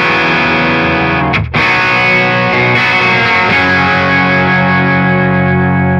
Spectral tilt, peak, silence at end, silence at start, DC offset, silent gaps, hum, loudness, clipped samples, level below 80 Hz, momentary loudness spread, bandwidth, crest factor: -6.5 dB/octave; 0 dBFS; 0 s; 0 s; under 0.1%; none; none; -9 LUFS; under 0.1%; -34 dBFS; 3 LU; 8 kHz; 10 dB